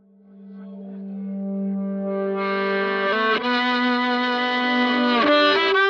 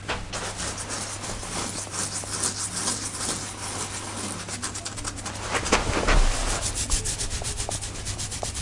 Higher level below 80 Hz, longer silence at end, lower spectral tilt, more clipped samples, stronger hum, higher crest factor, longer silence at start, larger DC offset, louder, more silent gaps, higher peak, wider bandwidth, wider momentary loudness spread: second, -70 dBFS vs -32 dBFS; about the same, 0 s vs 0 s; first, -6 dB/octave vs -2.5 dB/octave; neither; neither; second, 14 dB vs 24 dB; first, 0.35 s vs 0 s; neither; first, -21 LUFS vs -28 LUFS; neither; second, -8 dBFS vs -4 dBFS; second, 7.2 kHz vs 11.5 kHz; first, 17 LU vs 8 LU